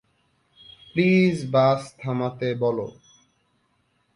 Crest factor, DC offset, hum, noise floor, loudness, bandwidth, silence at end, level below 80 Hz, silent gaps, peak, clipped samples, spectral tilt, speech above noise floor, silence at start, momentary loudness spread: 18 dB; under 0.1%; none; -68 dBFS; -23 LUFS; 11 kHz; 1.25 s; -64 dBFS; none; -8 dBFS; under 0.1%; -7.5 dB/octave; 47 dB; 0.95 s; 11 LU